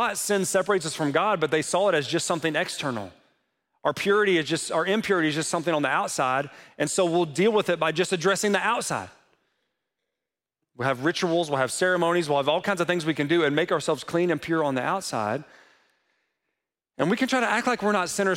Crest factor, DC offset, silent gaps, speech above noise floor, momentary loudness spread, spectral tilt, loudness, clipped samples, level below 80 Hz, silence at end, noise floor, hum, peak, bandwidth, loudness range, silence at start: 18 dB; under 0.1%; none; 63 dB; 6 LU; -4 dB/octave; -24 LUFS; under 0.1%; -70 dBFS; 0 s; -88 dBFS; none; -8 dBFS; 16.5 kHz; 4 LU; 0 s